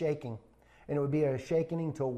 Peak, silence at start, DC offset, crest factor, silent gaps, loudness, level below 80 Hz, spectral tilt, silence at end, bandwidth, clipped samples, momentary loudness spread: -20 dBFS; 0 s; under 0.1%; 14 dB; none; -33 LUFS; -64 dBFS; -8.5 dB/octave; 0 s; 9.6 kHz; under 0.1%; 11 LU